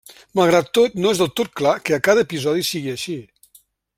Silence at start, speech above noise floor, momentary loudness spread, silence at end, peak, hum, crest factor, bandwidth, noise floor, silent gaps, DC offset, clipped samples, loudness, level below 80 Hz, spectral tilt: 0.1 s; 36 dB; 10 LU; 0.75 s; -2 dBFS; none; 18 dB; 16 kHz; -55 dBFS; none; under 0.1%; under 0.1%; -19 LUFS; -58 dBFS; -4.5 dB/octave